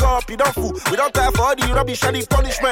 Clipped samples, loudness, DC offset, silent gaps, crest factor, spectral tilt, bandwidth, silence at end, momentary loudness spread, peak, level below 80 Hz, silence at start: under 0.1%; -18 LUFS; under 0.1%; none; 10 dB; -4 dB/octave; 17 kHz; 0 s; 3 LU; -6 dBFS; -24 dBFS; 0 s